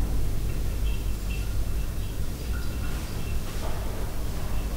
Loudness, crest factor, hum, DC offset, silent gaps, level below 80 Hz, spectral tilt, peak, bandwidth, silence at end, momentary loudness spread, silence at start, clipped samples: -32 LUFS; 12 dB; 50 Hz at -35 dBFS; under 0.1%; none; -30 dBFS; -5.5 dB/octave; -14 dBFS; 16 kHz; 0 s; 3 LU; 0 s; under 0.1%